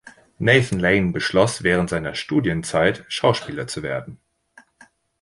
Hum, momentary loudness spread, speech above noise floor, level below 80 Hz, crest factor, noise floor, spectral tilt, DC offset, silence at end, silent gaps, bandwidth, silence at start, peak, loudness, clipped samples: none; 11 LU; 34 dB; -46 dBFS; 20 dB; -54 dBFS; -5 dB/octave; under 0.1%; 1.05 s; none; 11.5 kHz; 0.05 s; 0 dBFS; -20 LUFS; under 0.1%